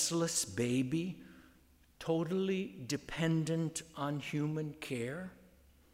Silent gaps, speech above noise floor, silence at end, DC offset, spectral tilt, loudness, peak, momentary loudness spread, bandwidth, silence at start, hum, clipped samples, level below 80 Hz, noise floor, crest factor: none; 30 dB; 0.6 s; under 0.1%; -4.5 dB/octave; -36 LUFS; -20 dBFS; 9 LU; 16 kHz; 0 s; none; under 0.1%; -66 dBFS; -65 dBFS; 16 dB